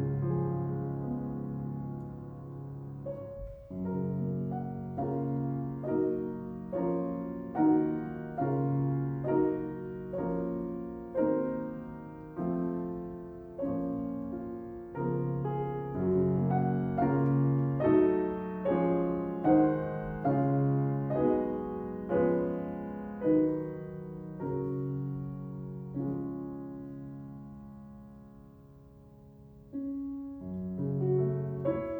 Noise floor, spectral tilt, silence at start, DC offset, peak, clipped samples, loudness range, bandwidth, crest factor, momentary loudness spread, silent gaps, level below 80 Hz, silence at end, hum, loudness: -54 dBFS; -12 dB/octave; 0 s; under 0.1%; -14 dBFS; under 0.1%; 12 LU; 3.3 kHz; 18 dB; 15 LU; none; -56 dBFS; 0 s; none; -32 LUFS